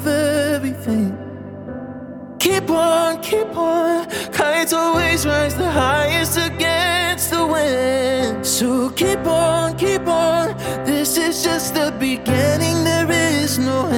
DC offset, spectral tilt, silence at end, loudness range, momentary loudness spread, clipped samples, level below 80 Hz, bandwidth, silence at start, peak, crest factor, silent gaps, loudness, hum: under 0.1%; -4 dB/octave; 0 s; 3 LU; 6 LU; under 0.1%; -42 dBFS; 17.5 kHz; 0 s; -2 dBFS; 16 dB; none; -18 LUFS; none